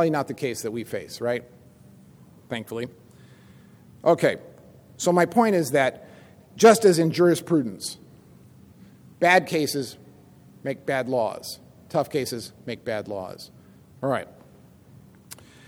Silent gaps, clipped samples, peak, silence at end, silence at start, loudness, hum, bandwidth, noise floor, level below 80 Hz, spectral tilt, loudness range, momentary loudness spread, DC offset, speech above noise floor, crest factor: none; under 0.1%; -4 dBFS; 0.35 s; 0 s; -24 LUFS; none; 19.5 kHz; -51 dBFS; -66 dBFS; -5 dB/octave; 12 LU; 19 LU; under 0.1%; 29 dB; 22 dB